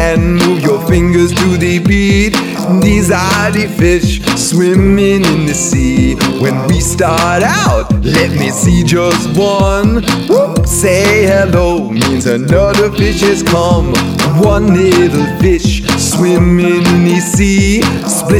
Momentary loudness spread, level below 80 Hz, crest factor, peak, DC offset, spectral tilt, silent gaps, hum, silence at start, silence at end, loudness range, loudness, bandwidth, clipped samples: 4 LU; -22 dBFS; 10 dB; 0 dBFS; under 0.1%; -5 dB/octave; none; none; 0 s; 0 s; 1 LU; -10 LUFS; 17 kHz; under 0.1%